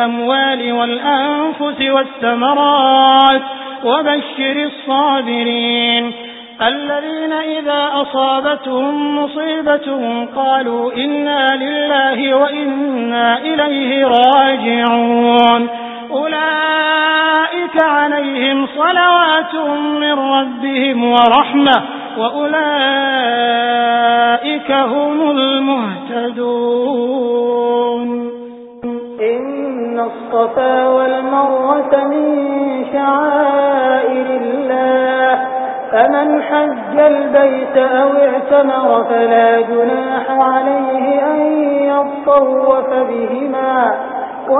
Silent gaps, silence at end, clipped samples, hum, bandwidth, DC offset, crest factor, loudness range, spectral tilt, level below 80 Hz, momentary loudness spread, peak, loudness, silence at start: none; 0 s; under 0.1%; none; 4 kHz; under 0.1%; 14 dB; 4 LU; -6.5 dB/octave; -60 dBFS; 8 LU; 0 dBFS; -13 LUFS; 0 s